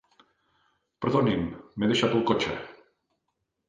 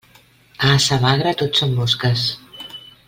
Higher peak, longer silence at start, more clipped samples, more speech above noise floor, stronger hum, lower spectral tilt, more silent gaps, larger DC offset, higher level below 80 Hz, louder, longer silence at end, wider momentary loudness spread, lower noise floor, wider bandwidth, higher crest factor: second, -8 dBFS vs -2 dBFS; first, 1 s vs 0.6 s; neither; first, 54 dB vs 34 dB; neither; first, -6 dB/octave vs -4.5 dB/octave; neither; neither; second, -56 dBFS vs -48 dBFS; second, -27 LUFS vs -17 LUFS; first, 0.95 s vs 0.3 s; second, 12 LU vs 18 LU; first, -80 dBFS vs -51 dBFS; second, 9.6 kHz vs 16.5 kHz; about the same, 20 dB vs 18 dB